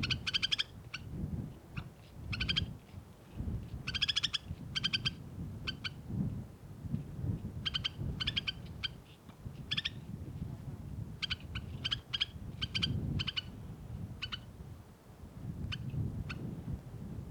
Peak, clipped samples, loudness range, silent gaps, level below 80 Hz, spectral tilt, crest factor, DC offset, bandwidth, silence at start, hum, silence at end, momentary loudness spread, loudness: -18 dBFS; under 0.1%; 5 LU; none; -52 dBFS; -4 dB/octave; 22 dB; under 0.1%; over 20 kHz; 0 s; none; 0 s; 17 LU; -38 LUFS